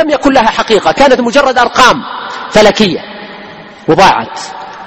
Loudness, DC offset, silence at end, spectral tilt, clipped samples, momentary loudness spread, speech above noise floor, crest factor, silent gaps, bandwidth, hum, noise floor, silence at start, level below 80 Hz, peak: -8 LUFS; under 0.1%; 0 s; -4 dB/octave; 2%; 18 LU; 22 dB; 10 dB; none; 17 kHz; none; -30 dBFS; 0 s; -36 dBFS; 0 dBFS